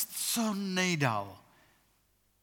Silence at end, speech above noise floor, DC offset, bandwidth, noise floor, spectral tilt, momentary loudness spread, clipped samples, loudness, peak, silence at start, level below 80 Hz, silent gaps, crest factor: 1.05 s; 40 dB; under 0.1%; 19 kHz; -72 dBFS; -3.5 dB/octave; 8 LU; under 0.1%; -31 LUFS; -12 dBFS; 0 s; -78 dBFS; none; 22 dB